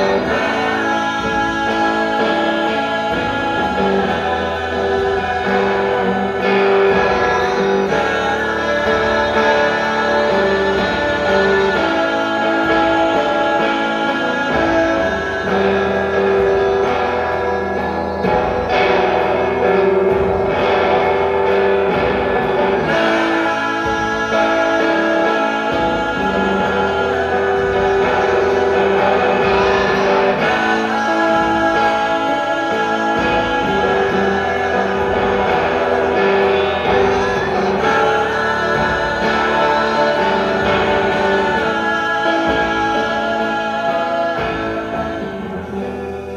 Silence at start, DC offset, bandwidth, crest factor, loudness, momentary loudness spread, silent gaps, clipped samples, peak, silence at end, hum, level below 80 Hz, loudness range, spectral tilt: 0 s; under 0.1%; 10 kHz; 14 dB; -16 LUFS; 4 LU; none; under 0.1%; -2 dBFS; 0 s; none; -38 dBFS; 2 LU; -5.5 dB/octave